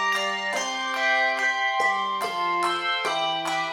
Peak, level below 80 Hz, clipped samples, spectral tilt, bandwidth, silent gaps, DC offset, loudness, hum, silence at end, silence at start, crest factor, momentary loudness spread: -10 dBFS; -72 dBFS; under 0.1%; -1 dB/octave; 17 kHz; none; under 0.1%; -24 LUFS; none; 0 s; 0 s; 14 dB; 5 LU